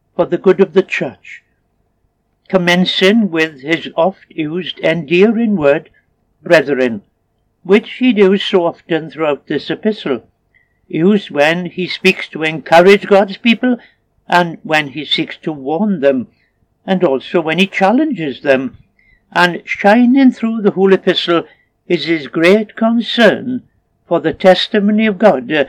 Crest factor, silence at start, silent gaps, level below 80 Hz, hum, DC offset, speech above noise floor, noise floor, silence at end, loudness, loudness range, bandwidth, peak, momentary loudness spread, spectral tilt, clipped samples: 14 dB; 0.2 s; none; -58 dBFS; none; under 0.1%; 50 dB; -62 dBFS; 0 s; -13 LUFS; 4 LU; 13 kHz; 0 dBFS; 10 LU; -6 dB/octave; 0.1%